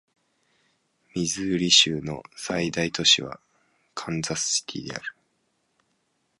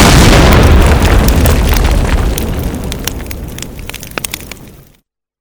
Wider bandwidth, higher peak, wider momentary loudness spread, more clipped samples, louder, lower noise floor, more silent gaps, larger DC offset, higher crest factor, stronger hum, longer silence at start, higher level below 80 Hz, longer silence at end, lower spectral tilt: second, 11.5 kHz vs over 20 kHz; second, -4 dBFS vs 0 dBFS; about the same, 20 LU vs 18 LU; second, under 0.1% vs 1%; second, -23 LUFS vs -10 LUFS; first, -72 dBFS vs -52 dBFS; neither; neither; first, 24 dB vs 10 dB; neither; first, 1.15 s vs 0 s; second, -58 dBFS vs -12 dBFS; first, 1.3 s vs 0.7 s; second, -2 dB/octave vs -5 dB/octave